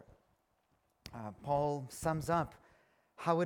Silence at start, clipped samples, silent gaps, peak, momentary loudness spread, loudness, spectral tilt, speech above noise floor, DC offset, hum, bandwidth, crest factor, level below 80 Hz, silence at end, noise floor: 1.05 s; under 0.1%; none; -16 dBFS; 14 LU; -37 LUFS; -6.5 dB/octave; 41 dB; under 0.1%; none; 18 kHz; 22 dB; -62 dBFS; 0 s; -77 dBFS